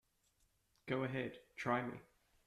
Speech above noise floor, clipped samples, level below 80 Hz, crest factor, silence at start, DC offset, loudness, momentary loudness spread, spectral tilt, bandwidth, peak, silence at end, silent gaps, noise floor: 37 dB; under 0.1%; -76 dBFS; 20 dB; 0.85 s; under 0.1%; -42 LUFS; 14 LU; -6.5 dB/octave; 14 kHz; -24 dBFS; 0.45 s; none; -78 dBFS